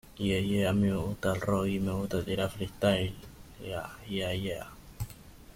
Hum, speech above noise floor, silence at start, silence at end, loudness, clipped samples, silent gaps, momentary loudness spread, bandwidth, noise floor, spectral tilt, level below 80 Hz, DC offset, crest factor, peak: none; 20 dB; 0.05 s; 0.05 s; -31 LUFS; under 0.1%; none; 14 LU; 16.5 kHz; -50 dBFS; -6 dB/octave; -50 dBFS; under 0.1%; 20 dB; -12 dBFS